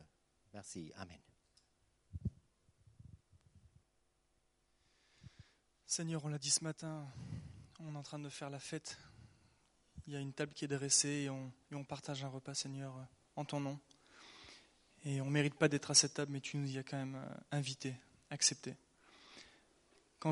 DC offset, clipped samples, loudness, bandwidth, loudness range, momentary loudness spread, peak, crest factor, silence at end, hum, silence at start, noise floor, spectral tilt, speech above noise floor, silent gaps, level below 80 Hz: under 0.1%; under 0.1%; -39 LUFS; 11.5 kHz; 17 LU; 23 LU; -16 dBFS; 28 dB; 0 s; none; 0 s; -79 dBFS; -3 dB/octave; 38 dB; none; -68 dBFS